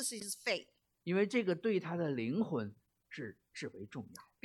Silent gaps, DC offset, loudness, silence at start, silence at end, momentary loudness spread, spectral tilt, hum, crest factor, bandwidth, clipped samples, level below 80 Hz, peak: none; under 0.1%; -38 LUFS; 0 s; 0.2 s; 15 LU; -4.5 dB/octave; none; 18 dB; 14.5 kHz; under 0.1%; -82 dBFS; -20 dBFS